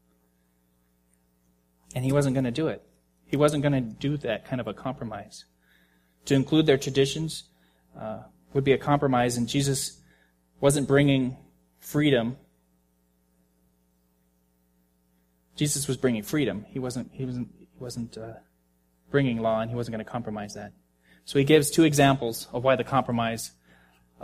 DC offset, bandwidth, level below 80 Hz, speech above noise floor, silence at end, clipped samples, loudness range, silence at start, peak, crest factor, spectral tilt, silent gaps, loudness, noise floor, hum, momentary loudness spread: under 0.1%; 15.5 kHz; -56 dBFS; 43 dB; 0 s; under 0.1%; 7 LU; 1.95 s; -6 dBFS; 22 dB; -5.5 dB/octave; none; -26 LUFS; -68 dBFS; 60 Hz at -55 dBFS; 19 LU